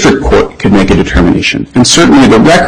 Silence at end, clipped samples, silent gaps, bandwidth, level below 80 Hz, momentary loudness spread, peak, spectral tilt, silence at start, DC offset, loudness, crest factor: 0 s; 0.5%; none; 13 kHz; -20 dBFS; 6 LU; 0 dBFS; -4.5 dB/octave; 0 s; under 0.1%; -6 LUFS; 6 dB